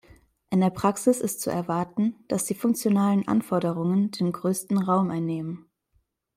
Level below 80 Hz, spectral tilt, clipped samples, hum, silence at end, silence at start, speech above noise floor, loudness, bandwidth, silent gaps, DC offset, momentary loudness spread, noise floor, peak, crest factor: -64 dBFS; -6.5 dB/octave; under 0.1%; none; 0.75 s; 0.5 s; 46 dB; -25 LUFS; 16 kHz; none; under 0.1%; 6 LU; -70 dBFS; -8 dBFS; 16 dB